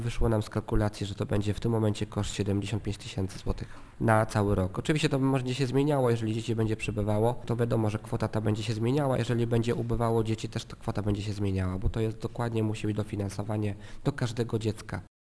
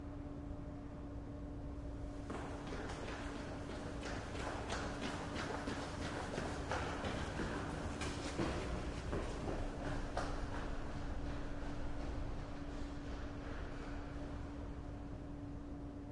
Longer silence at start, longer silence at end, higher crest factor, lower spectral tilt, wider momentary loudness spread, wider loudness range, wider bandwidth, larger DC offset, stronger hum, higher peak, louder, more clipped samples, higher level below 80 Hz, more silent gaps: about the same, 0 s vs 0 s; first, 0.2 s vs 0 s; about the same, 20 dB vs 18 dB; first, -7 dB/octave vs -5.5 dB/octave; about the same, 8 LU vs 7 LU; about the same, 4 LU vs 5 LU; about the same, 11 kHz vs 11.5 kHz; neither; neither; first, -8 dBFS vs -24 dBFS; first, -30 LUFS vs -45 LUFS; neither; first, -42 dBFS vs -48 dBFS; neither